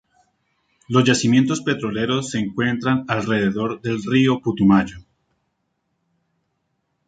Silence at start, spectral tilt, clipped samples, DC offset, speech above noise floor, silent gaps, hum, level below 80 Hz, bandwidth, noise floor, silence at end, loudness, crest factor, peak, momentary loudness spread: 0.9 s; -5.5 dB/octave; under 0.1%; under 0.1%; 54 dB; none; none; -52 dBFS; 9.2 kHz; -73 dBFS; 2.05 s; -19 LUFS; 18 dB; -2 dBFS; 8 LU